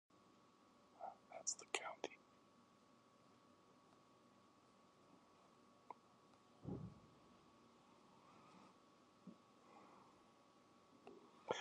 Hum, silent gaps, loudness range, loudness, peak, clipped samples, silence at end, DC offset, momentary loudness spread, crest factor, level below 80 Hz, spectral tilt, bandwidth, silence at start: none; none; 15 LU; -52 LUFS; -22 dBFS; under 0.1%; 0 s; under 0.1%; 22 LU; 36 dB; -82 dBFS; -2.5 dB/octave; 10 kHz; 0.1 s